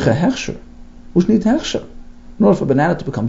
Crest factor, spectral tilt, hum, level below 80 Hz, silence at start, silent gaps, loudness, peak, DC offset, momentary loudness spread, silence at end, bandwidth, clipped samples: 16 dB; -6.5 dB/octave; none; -38 dBFS; 0 s; none; -17 LUFS; 0 dBFS; under 0.1%; 11 LU; 0 s; 7.8 kHz; under 0.1%